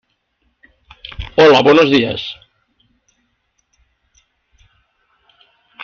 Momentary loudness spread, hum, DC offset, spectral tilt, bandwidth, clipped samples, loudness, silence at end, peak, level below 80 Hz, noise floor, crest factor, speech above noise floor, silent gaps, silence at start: 26 LU; none; under 0.1%; -5.5 dB/octave; 7 kHz; under 0.1%; -11 LUFS; 3.5 s; 0 dBFS; -44 dBFS; -66 dBFS; 18 dB; 55 dB; none; 1.2 s